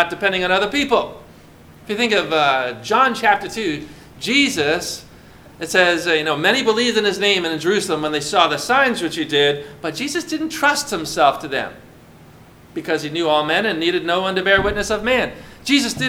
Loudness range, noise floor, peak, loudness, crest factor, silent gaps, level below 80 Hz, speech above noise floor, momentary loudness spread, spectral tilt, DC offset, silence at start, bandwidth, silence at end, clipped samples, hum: 4 LU; -44 dBFS; 0 dBFS; -18 LUFS; 20 dB; none; -46 dBFS; 26 dB; 10 LU; -3 dB/octave; under 0.1%; 0 s; 18 kHz; 0 s; under 0.1%; none